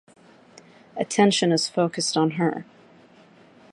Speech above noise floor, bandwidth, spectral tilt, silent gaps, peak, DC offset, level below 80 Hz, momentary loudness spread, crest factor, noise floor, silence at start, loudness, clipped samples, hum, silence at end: 31 dB; 11.5 kHz; -4.5 dB/octave; none; -4 dBFS; under 0.1%; -74 dBFS; 13 LU; 20 dB; -53 dBFS; 0.95 s; -22 LUFS; under 0.1%; none; 1.1 s